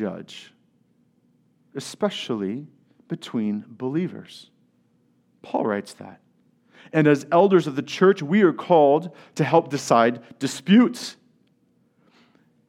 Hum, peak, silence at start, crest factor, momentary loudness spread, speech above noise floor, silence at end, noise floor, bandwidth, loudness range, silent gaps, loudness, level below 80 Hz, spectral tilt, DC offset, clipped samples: none; -4 dBFS; 0 s; 20 dB; 19 LU; 43 dB; 1.55 s; -64 dBFS; 14 kHz; 12 LU; none; -21 LUFS; -78 dBFS; -6 dB/octave; under 0.1%; under 0.1%